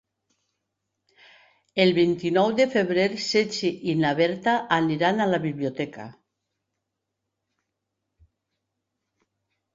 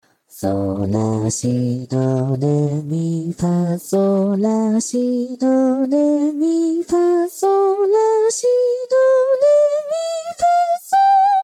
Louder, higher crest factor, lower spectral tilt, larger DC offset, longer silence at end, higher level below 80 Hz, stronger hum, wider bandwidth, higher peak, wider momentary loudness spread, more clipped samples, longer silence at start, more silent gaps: second, -23 LUFS vs -17 LUFS; first, 22 dB vs 10 dB; about the same, -5.5 dB/octave vs -6.5 dB/octave; neither; first, 3.6 s vs 0 s; second, -66 dBFS vs -56 dBFS; neither; second, 7.8 kHz vs 15.5 kHz; about the same, -6 dBFS vs -6 dBFS; first, 10 LU vs 7 LU; neither; first, 1.75 s vs 0.35 s; neither